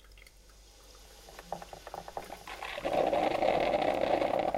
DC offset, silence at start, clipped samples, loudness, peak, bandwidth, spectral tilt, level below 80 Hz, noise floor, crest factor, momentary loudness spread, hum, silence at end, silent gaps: under 0.1%; 0.1 s; under 0.1%; -31 LUFS; -14 dBFS; 16.5 kHz; -4.5 dB/octave; -56 dBFS; -57 dBFS; 20 dB; 20 LU; none; 0 s; none